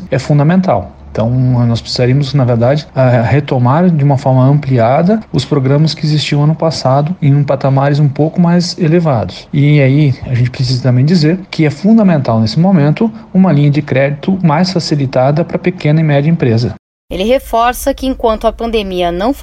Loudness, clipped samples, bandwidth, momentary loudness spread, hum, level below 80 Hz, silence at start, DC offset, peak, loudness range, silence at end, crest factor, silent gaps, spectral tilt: -11 LUFS; under 0.1%; 14 kHz; 5 LU; none; -36 dBFS; 0 s; under 0.1%; 0 dBFS; 2 LU; 0 s; 10 dB; 16.79-17.08 s; -7.5 dB/octave